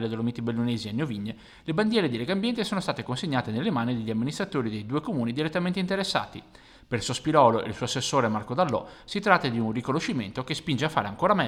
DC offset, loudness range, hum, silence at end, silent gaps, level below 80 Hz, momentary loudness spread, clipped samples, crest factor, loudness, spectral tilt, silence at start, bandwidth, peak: under 0.1%; 4 LU; none; 0 s; none; -58 dBFS; 9 LU; under 0.1%; 24 dB; -27 LUFS; -5.5 dB/octave; 0 s; 14 kHz; -4 dBFS